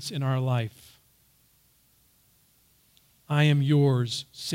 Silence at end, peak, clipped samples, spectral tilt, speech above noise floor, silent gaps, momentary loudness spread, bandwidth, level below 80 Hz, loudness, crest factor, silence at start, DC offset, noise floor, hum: 0 s; -12 dBFS; under 0.1%; -6 dB/octave; 39 dB; none; 10 LU; 15.5 kHz; -70 dBFS; -25 LUFS; 16 dB; 0 s; under 0.1%; -64 dBFS; none